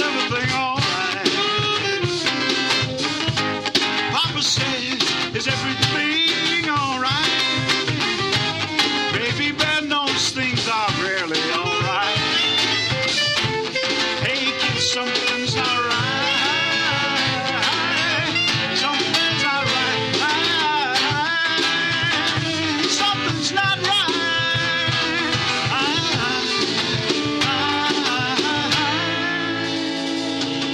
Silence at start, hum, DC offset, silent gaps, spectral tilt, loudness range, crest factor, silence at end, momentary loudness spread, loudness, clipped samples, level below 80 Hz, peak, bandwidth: 0 s; none; under 0.1%; none; -3 dB/octave; 1 LU; 16 dB; 0 s; 3 LU; -19 LUFS; under 0.1%; -52 dBFS; -4 dBFS; 15.5 kHz